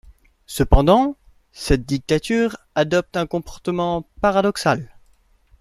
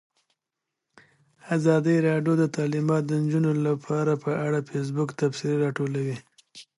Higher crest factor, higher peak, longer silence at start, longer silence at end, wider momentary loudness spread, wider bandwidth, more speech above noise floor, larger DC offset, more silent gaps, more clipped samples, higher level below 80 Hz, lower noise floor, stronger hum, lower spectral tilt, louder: about the same, 18 dB vs 18 dB; first, -2 dBFS vs -8 dBFS; second, 0.1 s vs 1.45 s; first, 0.75 s vs 0.15 s; first, 10 LU vs 7 LU; first, 15 kHz vs 11.5 kHz; second, 38 dB vs 61 dB; neither; neither; neither; first, -30 dBFS vs -72 dBFS; second, -57 dBFS vs -85 dBFS; neither; second, -6 dB/octave vs -7.5 dB/octave; first, -20 LUFS vs -25 LUFS